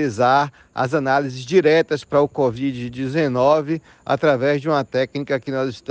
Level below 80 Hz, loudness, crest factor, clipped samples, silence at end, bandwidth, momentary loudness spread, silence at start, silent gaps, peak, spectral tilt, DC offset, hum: -56 dBFS; -19 LUFS; 16 dB; under 0.1%; 0.1 s; 9 kHz; 9 LU; 0 s; none; -4 dBFS; -6.5 dB/octave; under 0.1%; none